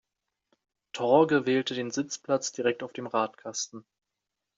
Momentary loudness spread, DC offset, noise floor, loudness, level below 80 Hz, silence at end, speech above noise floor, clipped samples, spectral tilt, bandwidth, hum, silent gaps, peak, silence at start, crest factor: 12 LU; under 0.1%; -86 dBFS; -28 LUFS; -76 dBFS; 0.75 s; 58 dB; under 0.1%; -4 dB/octave; 7.8 kHz; none; none; -8 dBFS; 0.95 s; 22 dB